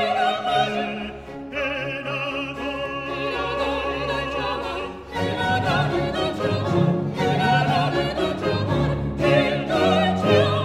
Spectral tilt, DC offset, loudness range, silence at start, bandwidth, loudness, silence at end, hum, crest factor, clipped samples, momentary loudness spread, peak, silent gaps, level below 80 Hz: -6.5 dB/octave; under 0.1%; 5 LU; 0 s; 13 kHz; -23 LUFS; 0 s; none; 18 dB; under 0.1%; 9 LU; -4 dBFS; none; -42 dBFS